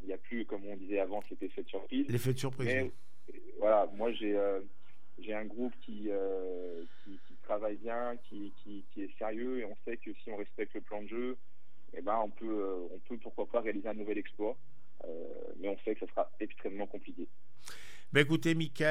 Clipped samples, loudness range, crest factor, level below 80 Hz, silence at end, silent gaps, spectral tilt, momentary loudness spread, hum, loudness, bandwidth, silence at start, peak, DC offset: under 0.1%; 7 LU; 24 dB; -76 dBFS; 0 s; none; -6 dB/octave; 18 LU; none; -37 LUFS; 15.5 kHz; 0 s; -12 dBFS; 2%